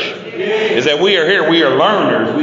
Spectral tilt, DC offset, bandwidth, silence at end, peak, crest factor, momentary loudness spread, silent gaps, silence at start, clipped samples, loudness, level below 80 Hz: -4.5 dB/octave; under 0.1%; 7.6 kHz; 0 s; 0 dBFS; 12 dB; 7 LU; none; 0 s; under 0.1%; -12 LUFS; -60 dBFS